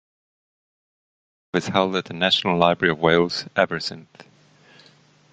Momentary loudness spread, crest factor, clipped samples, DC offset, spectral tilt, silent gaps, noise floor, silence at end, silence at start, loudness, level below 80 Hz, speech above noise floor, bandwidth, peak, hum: 10 LU; 22 dB; under 0.1%; under 0.1%; -5 dB/octave; none; -55 dBFS; 1.3 s; 1.55 s; -21 LUFS; -56 dBFS; 34 dB; 9.2 kHz; -2 dBFS; none